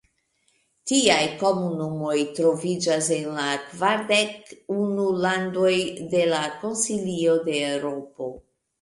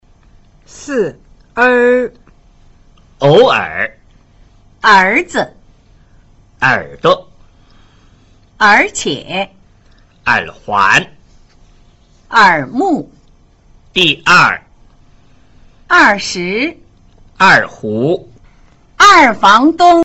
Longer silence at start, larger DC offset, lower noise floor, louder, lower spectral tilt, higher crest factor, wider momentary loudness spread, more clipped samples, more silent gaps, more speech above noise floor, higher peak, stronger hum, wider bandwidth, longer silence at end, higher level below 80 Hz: about the same, 0.85 s vs 0.8 s; neither; first, -68 dBFS vs -46 dBFS; second, -23 LUFS vs -11 LUFS; about the same, -3.5 dB/octave vs -4 dB/octave; first, 20 dB vs 14 dB; second, 9 LU vs 13 LU; neither; neither; first, 45 dB vs 36 dB; second, -4 dBFS vs 0 dBFS; neither; second, 11.5 kHz vs 15.5 kHz; first, 0.4 s vs 0 s; second, -64 dBFS vs -44 dBFS